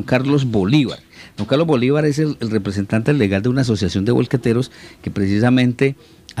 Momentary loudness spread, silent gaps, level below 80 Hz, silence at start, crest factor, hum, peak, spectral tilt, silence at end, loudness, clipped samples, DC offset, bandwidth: 13 LU; none; -48 dBFS; 0 s; 16 dB; none; 0 dBFS; -7 dB/octave; 0 s; -17 LUFS; under 0.1%; under 0.1%; 12.5 kHz